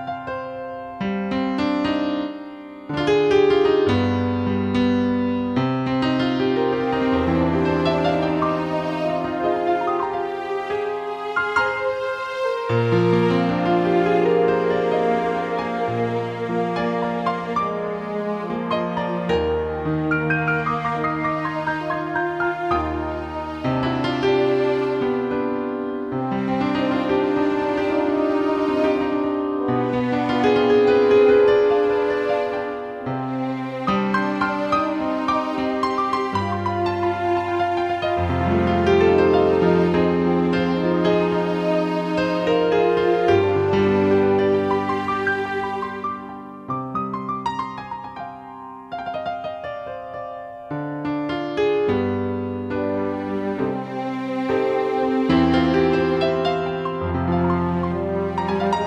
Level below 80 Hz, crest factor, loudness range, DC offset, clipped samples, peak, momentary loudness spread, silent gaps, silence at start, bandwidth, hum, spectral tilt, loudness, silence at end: -46 dBFS; 16 dB; 6 LU; under 0.1%; under 0.1%; -4 dBFS; 10 LU; none; 0 s; 8.6 kHz; none; -7.5 dB/octave; -21 LUFS; 0 s